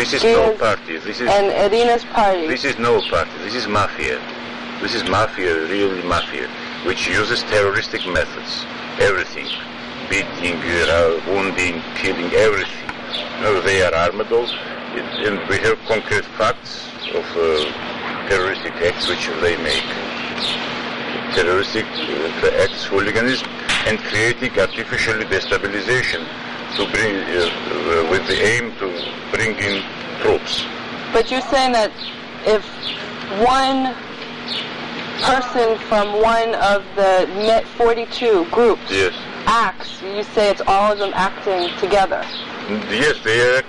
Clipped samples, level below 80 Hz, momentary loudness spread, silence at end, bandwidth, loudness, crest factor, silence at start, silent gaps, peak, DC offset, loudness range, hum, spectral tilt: under 0.1%; -42 dBFS; 10 LU; 0 s; 11.5 kHz; -18 LUFS; 14 dB; 0 s; none; -4 dBFS; under 0.1%; 3 LU; none; -3.5 dB/octave